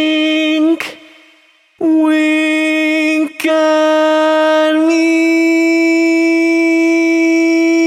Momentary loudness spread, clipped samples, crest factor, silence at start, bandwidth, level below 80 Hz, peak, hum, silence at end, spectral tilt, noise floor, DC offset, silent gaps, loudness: 3 LU; under 0.1%; 10 dB; 0 s; 13.5 kHz; -74 dBFS; -2 dBFS; none; 0 s; -2.5 dB/octave; -50 dBFS; under 0.1%; none; -12 LUFS